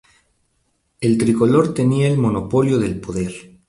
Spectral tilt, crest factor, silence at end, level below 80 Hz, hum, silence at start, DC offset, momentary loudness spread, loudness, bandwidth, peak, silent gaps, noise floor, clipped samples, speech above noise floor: -7.5 dB/octave; 16 dB; 0.3 s; -46 dBFS; none; 1 s; under 0.1%; 10 LU; -18 LUFS; 11.5 kHz; -2 dBFS; none; -67 dBFS; under 0.1%; 50 dB